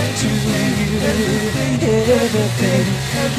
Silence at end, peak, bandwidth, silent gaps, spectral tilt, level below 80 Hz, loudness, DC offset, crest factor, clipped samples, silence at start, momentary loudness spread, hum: 0 s; -4 dBFS; 15.5 kHz; none; -5 dB/octave; -36 dBFS; -17 LUFS; under 0.1%; 14 dB; under 0.1%; 0 s; 3 LU; none